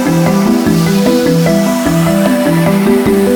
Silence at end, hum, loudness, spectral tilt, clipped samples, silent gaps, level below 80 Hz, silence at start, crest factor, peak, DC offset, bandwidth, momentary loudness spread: 0 s; none; -10 LUFS; -6 dB/octave; under 0.1%; none; -36 dBFS; 0 s; 10 dB; 0 dBFS; under 0.1%; 19.5 kHz; 1 LU